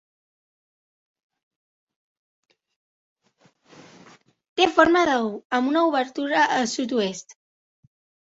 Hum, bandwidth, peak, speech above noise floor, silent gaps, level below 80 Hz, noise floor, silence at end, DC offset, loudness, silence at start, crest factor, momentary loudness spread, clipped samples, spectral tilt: none; 8 kHz; -2 dBFS; 41 dB; 5.45-5.50 s; -64 dBFS; -63 dBFS; 0.95 s; under 0.1%; -21 LUFS; 4.55 s; 24 dB; 9 LU; under 0.1%; -3.5 dB/octave